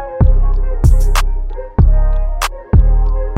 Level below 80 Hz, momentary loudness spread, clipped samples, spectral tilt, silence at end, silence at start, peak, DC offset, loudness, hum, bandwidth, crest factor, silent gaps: -12 dBFS; 8 LU; under 0.1%; -6 dB/octave; 0 s; 0 s; 0 dBFS; under 0.1%; -16 LUFS; none; 13.5 kHz; 10 dB; none